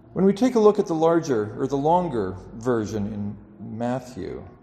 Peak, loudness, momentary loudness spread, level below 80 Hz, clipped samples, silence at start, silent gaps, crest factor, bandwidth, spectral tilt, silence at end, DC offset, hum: -4 dBFS; -23 LUFS; 16 LU; -52 dBFS; under 0.1%; 0.15 s; none; 20 dB; 12.5 kHz; -7.5 dB/octave; 0.1 s; under 0.1%; none